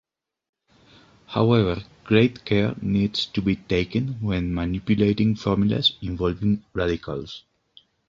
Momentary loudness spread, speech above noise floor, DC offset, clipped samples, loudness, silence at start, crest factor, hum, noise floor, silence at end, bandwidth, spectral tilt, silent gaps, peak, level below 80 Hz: 9 LU; 35 dB; under 0.1%; under 0.1%; -23 LUFS; 1.3 s; 20 dB; none; -57 dBFS; 0.7 s; 7.4 kHz; -7.5 dB/octave; none; -4 dBFS; -42 dBFS